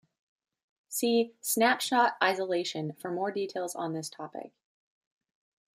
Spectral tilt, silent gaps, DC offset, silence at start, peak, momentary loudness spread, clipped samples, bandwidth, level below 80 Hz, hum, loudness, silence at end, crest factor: -3 dB/octave; none; under 0.1%; 0.9 s; -10 dBFS; 13 LU; under 0.1%; 15.5 kHz; -84 dBFS; none; -29 LUFS; 1.25 s; 22 dB